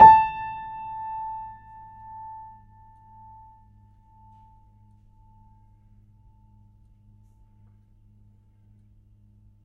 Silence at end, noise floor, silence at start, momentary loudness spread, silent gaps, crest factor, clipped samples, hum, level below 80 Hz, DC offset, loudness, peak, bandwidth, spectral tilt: 8.2 s; -56 dBFS; 0 s; 26 LU; none; 26 dB; under 0.1%; none; -54 dBFS; under 0.1%; -23 LUFS; 0 dBFS; 4.8 kHz; -7 dB/octave